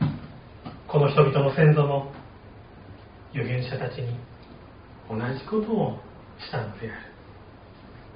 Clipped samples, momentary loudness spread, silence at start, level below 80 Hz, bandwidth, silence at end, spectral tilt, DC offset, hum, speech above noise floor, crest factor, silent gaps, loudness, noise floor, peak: under 0.1%; 27 LU; 0 s; -52 dBFS; 5.2 kHz; 0 s; -7 dB/octave; under 0.1%; none; 23 dB; 22 dB; none; -25 LUFS; -47 dBFS; -4 dBFS